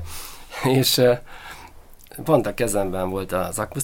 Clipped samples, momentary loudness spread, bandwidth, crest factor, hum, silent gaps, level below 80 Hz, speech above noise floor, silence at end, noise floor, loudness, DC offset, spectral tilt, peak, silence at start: under 0.1%; 22 LU; 17 kHz; 20 dB; none; none; -42 dBFS; 23 dB; 0 s; -44 dBFS; -21 LUFS; under 0.1%; -4.5 dB/octave; -4 dBFS; 0 s